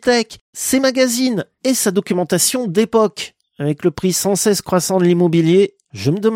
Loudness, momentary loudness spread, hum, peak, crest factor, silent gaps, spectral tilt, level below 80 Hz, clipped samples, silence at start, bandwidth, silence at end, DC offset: -16 LUFS; 9 LU; none; -2 dBFS; 14 dB; 0.41-0.53 s; -4.5 dB/octave; -54 dBFS; under 0.1%; 0.05 s; 16.5 kHz; 0 s; under 0.1%